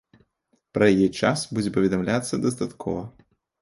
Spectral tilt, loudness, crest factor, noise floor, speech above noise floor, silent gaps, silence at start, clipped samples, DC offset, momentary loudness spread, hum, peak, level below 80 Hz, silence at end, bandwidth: -5.5 dB/octave; -24 LUFS; 20 dB; -70 dBFS; 47 dB; none; 0.75 s; under 0.1%; under 0.1%; 12 LU; none; -4 dBFS; -54 dBFS; 0.55 s; 11.5 kHz